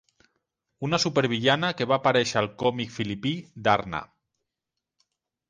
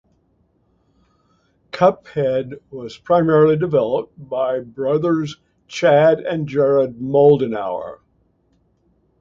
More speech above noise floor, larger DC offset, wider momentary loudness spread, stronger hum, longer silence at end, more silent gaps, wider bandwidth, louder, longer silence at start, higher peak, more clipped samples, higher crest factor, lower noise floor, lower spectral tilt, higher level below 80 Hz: first, 61 dB vs 45 dB; neither; second, 9 LU vs 18 LU; neither; first, 1.45 s vs 1.25 s; neither; first, 9.8 kHz vs 7.6 kHz; second, -25 LUFS vs -17 LUFS; second, 0.8 s vs 1.75 s; second, -6 dBFS vs -2 dBFS; neither; about the same, 22 dB vs 18 dB; first, -86 dBFS vs -62 dBFS; second, -4.5 dB/octave vs -7.5 dB/octave; about the same, -60 dBFS vs -58 dBFS